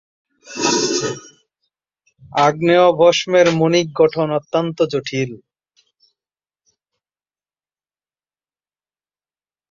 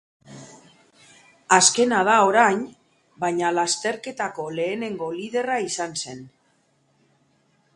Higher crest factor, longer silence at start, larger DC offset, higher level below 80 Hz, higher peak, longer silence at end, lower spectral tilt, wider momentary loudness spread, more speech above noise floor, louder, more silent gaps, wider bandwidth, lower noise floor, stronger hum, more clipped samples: second, 18 dB vs 24 dB; first, 0.5 s vs 0.3 s; neither; first, -62 dBFS vs -68 dBFS; about the same, 0 dBFS vs 0 dBFS; first, 4.35 s vs 1.5 s; first, -4.5 dB/octave vs -2 dB/octave; second, 11 LU vs 14 LU; first, over 75 dB vs 43 dB; first, -16 LUFS vs -21 LUFS; neither; second, 7.8 kHz vs 11.5 kHz; first, under -90 dBFS vs -65 dBFS; first, 50 Hz at -50 dBFS vs none; neither